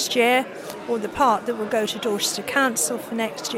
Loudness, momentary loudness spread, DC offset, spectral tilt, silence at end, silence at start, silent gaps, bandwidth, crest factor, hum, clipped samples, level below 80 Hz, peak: -22 LUFS; 8 LU; under 0.1%; -2 dB/octave; 0 s; 0 s; none; 16.5 kHz; 16 dB; none; under 0.1%; -58 dBFS; -6 dBFS